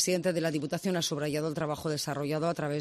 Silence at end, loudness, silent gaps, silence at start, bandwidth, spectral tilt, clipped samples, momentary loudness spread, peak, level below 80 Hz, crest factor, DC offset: 0 s; -31 LUFS; none; 0 s; 14 kHz; -4.5 dB/octave; under 0.1%; 3 LU; -14 dBFS; -66 dBFS; 18 dB; under 0.1%